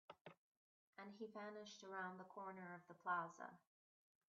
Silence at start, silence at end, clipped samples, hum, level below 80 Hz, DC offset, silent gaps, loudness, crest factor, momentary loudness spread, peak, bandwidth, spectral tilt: 0.1 s; 0.75 s; under 0.1%; none; under -90 dBFS; under 0.1%; 0.21-0.25 s, 0.38-0.93 s; -52 LUFS; 22 dB; 17 LU; -32 dBFS; 7.4 kHz; -3 dB/octave